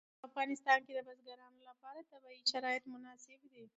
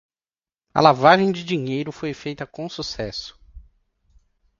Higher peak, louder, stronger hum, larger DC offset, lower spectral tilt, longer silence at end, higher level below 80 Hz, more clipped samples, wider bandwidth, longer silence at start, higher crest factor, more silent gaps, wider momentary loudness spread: second, -18 dBFS vs 0 dBFS; second, -37 LUFS vs -21 LUFS; neither; neither; second, 2 dB/octave vs -5.5 dB/octave; second, 0.1 s vs 1 s; second, under -90 dBFS vs -52 dBFS; neither; about the same, 8 kHz vs 7.6 kHz; second, 0.25 s vs 0.75 s; about the same, 24 dB vs 22 dB; neither; first, 25 LU vs 17 LU